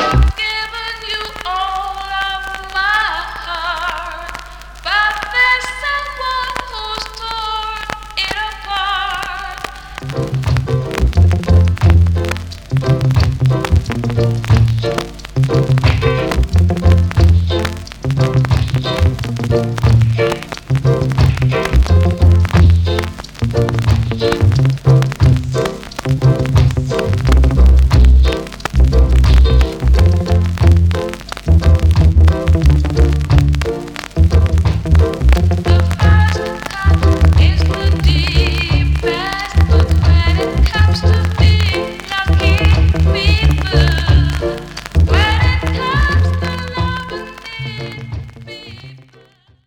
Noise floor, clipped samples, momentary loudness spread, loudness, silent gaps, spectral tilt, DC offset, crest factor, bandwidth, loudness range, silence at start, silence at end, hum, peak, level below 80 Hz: -48 dBFS; under 0.1%; 11 LU; -14 LUFS; none; -6.5 dB/octave; under 0.1%; 10 dB; 11.5 kHz; 6 LU; 0 s; 0.7 s; none; -2 dBFS; -18 dBFS